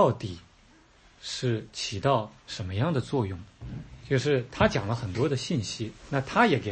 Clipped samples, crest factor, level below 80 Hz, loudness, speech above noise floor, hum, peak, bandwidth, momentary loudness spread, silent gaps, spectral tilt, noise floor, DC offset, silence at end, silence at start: under 0.1%; 20 dB; -52 dBFS; -28 LUFS; 30 dB; none; -8 dBFS; 8.8 kHz; 17 LU; none; -5.5 dB/octave; -58 dBFS; under 0.1%; 0 s; 0 s